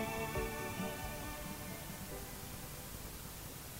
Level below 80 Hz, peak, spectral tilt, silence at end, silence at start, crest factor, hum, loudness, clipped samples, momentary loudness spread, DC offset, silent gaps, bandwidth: -52 dBFS; -26 dBFS; -4 dB/octave; 0 s; 0 s; 18 dB; none; -43 LUFS; under 0.1%; 7 LU; under 0.1%; none; 16 kHz